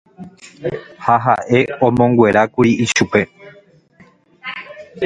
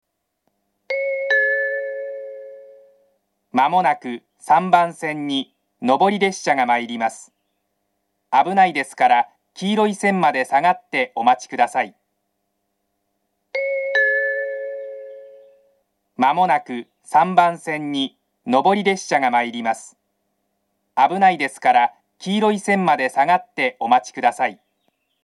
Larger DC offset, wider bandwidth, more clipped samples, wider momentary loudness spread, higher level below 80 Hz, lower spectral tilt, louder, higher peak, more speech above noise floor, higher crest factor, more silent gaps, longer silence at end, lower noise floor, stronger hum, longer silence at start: neither; second, 9.4 kHz vs 12 kHz; neither; first, 19 LU vs 13 LU; first, -50 dBFS vs -80 dBFS; about the same, -5.5 dB/octave vs -4.5 dB/octave; first, -15 LUFS vs -19 LUFS; about the same, 0 dBFS vs 0 dBFS; second, 35 dB vs 55 dB; about the same, 16 dB vs 20 dB; neither; second, 0 s vs 0.7 s; second, -50 dBFS vs -73 dBFS; neither; second, 0.2 s vs 0.9 s